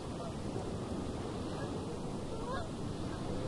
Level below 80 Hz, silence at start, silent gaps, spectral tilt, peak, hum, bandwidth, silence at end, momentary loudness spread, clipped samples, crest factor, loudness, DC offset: -50 dBFS; 0 s; none; -6.5 dB/octave; -26 dBFS; none; 11.5 kHz; 0 s; 1 LU; under 0.1%; 14 dB; -40 LUFS; under 0.1%